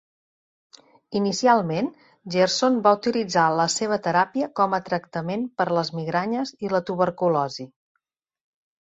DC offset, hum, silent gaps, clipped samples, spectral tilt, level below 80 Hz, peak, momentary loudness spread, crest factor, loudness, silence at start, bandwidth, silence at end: under 0.1%; none; none; under 0.1%; -4.5 dB/octave; -66 dBFS; -4 dBFS; 9 LU; 20 dB; -23 LUFS; 1.1 s; 8 kHz; 1.15 s